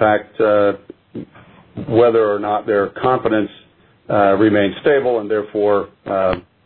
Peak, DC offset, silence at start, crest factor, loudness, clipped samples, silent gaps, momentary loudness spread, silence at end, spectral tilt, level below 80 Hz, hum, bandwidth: -2 dBFS; under 0.1%; 0 s; 16 dB; -17 LUFS; under 0.1%; none; 17 LU; 0.25 s; -10.5 dB/octave; -50 dBFS; none; 4.5 kHz